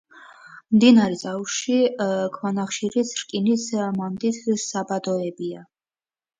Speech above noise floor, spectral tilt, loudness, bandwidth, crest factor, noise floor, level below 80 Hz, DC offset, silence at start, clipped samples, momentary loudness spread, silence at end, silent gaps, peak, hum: over 68 dB; -4.5 dB/octave; -22 LUFS; 9.4 kHz; 20 dB; under -90 dBFS; -68 dBFS; under 0.1%; 0.15 s; under 0.1%; 10 LU; 0.75 s; none; -4 dBFS; none